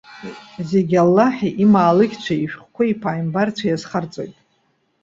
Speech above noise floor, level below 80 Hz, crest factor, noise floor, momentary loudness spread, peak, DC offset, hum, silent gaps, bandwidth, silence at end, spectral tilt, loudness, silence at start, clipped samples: 47 dB; -58 dBFS; 16 dB; -65 dBFS; 18 LU; -2 dBFS; under 0.1%; none; none; 7.6 kHz; 0.7 s; -7.5 dB/octave; -18 LUFS; 0.1 s; under 0.1%